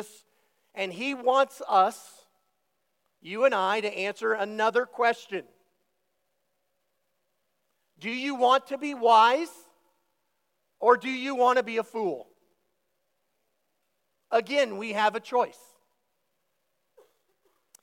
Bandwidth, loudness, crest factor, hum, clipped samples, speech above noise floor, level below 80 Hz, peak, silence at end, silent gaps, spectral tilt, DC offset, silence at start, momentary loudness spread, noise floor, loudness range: 16.5 kHz; -26 LUFS; 22 dB; none; under 0.1%; 53 dB; under -90 dBFS; -6 dBFS; 2.3 s; none; -3.5 dB/octave; under 0.1%; 0 s; 12 LU; -78 dBFS; 7 LU